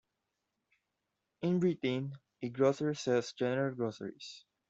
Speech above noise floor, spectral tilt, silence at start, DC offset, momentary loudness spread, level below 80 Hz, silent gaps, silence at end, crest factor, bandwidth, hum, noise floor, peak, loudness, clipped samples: 52 dB; -6.5 dB/octave; 1.4 s; under 0.1%; 14 LU; -76 dBFS; none; 0.3 s; 18 dB; 8 kHz; none; -86 dBFS; -16 dBFS; -34 LUFS; under 0.1%